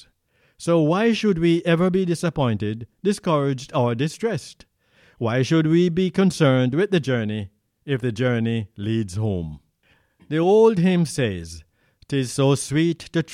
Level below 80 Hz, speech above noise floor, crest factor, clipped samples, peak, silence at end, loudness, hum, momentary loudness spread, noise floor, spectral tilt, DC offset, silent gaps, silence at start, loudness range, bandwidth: -52 dBFS; 43 dB; 18 dB; under 0.1%; -4 dBFS; 0 s; -21 LUFS; none; 11 LU; -64 dBFS; -6.5 dB/octave; under 0.1%; none; 0.6 s; 4 LU; 13.5 kHz